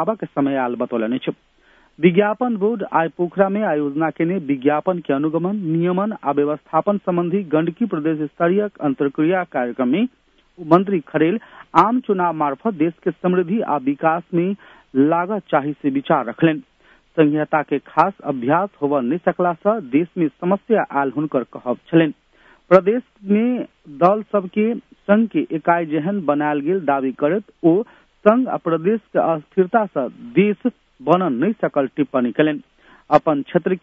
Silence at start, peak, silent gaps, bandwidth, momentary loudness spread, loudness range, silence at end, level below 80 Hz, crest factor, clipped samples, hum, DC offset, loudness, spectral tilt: 0 s; 0 dBFS; none; 6.2 kHz; 6 LU; 1 LU; 0.05 s; -64 dBFS; 18 dB; under 0.1%; none; under 0.1%; -19 LUFS; -9.5 dB/octave